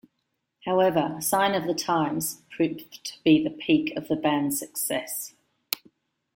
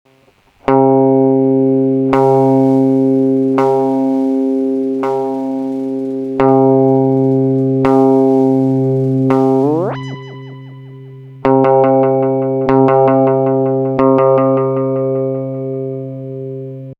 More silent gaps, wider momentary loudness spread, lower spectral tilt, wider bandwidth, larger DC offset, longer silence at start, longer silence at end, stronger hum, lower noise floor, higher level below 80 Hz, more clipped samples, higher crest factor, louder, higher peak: neither; about the same, 11 LU vs 12 LU; second, -4 dB/octave vs -10 dB/octave; first, 17 kHz vs 5.2 kHz; neither; about the same, 0.65 s vs 0.65 s; first, 0.6 s vs 0.05 s; neither; first, -78 dBFS vs -51 dBFS; second, -66 dBFS vs -52 dBFS; neither; first, 26 dB vs 12 dB; second, -26 LUFS vs -13 LUFS; about the same, -2 dBFS vs 0 dBFS